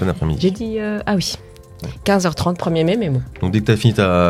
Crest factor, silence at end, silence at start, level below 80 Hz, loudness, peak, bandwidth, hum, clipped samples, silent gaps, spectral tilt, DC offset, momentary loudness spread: 16 dB; 0 s; 0 s; -40 dBFS; -18 LUFS; 0 dBFS; 15.5 kHz; none; under 0.1%; none; -6 dB/octave; under 0.1%; 9 LU